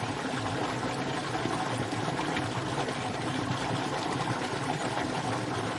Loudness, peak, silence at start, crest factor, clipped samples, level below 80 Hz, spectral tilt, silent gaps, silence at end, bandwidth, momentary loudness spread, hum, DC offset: -31 LUFS; -18 dBFS; 0 s; 14 dB; under 0.1%; -58 dBFS; -5 dB/octave; none; 0 s; 11.5 kHz; 1 LU; none; under 0.1%